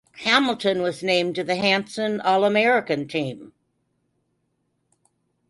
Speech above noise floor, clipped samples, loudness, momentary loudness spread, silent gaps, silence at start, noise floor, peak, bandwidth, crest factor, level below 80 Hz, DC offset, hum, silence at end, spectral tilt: 51 dB; under 0.1%; -21 LUFS; 9 LU; none; 0.15 s; -72 dBFS; -2 dBFS; 11.5 kHz; 22 dB; -68 dBFS; under 0.1%; none; 2 s; -4.5 dB/octave